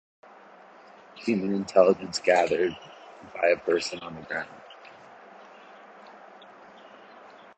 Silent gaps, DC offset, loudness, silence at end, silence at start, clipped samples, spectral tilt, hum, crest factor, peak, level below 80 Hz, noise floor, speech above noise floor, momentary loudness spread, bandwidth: none; under 0.1%; -26 LUFS; 0.3 s; 1.15 s; under 0.1%; -4.5 dB/octave; none; 24 dB; -4 dBFS; -68 dBFS; -51 dBFS; 26 dB; 26 LU; 9.2 kHz